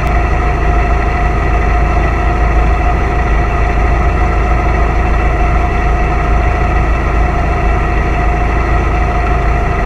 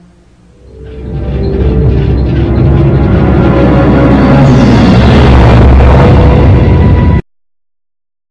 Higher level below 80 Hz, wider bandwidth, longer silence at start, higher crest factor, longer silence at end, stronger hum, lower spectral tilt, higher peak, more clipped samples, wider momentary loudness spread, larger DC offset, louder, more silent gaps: about the same, -12 dBFS vs -12 dBFS; about the same, 7 kHz vs 7.2 kHz; second, 0 s vs 0.8 s; about the same, 10 dB vs 6 dB; second, 0 s vs 1.1 s; neither; about the same, -7.5 dB/octave vs -8.5 dB/octave; about the same, 0 dBFS vs 0 dBFS; second, under 0.1% vs 7%; second, 1 LU vs 8 LU; neither; second, -13 LUFS vs -6 LUFS; neither